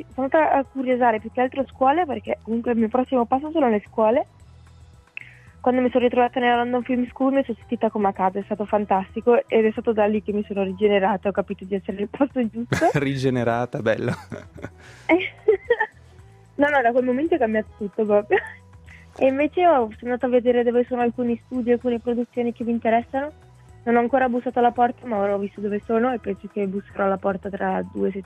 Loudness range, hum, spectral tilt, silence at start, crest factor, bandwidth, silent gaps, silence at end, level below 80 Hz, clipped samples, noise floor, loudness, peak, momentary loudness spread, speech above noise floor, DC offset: 2 LU; none; -7 dB/octave; 0 s; 16 dB; 10.5 kHz; none; 0 s; -56 dBFS; under 0.1%; -49 dBFS; -22 LUFS; -6 dBFS; 9 LU; 27 dB; under 0.1%